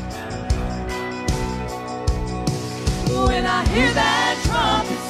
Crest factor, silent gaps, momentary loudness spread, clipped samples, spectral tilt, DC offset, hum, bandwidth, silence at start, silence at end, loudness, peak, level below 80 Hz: 16 dB; none; 9 LU; under 0.1%; -4.5 dB/octave; under 0.1%; none; 15 kHz; 0 s; 0 s; -21 LUFS; -4 dBFS; -28 dBFS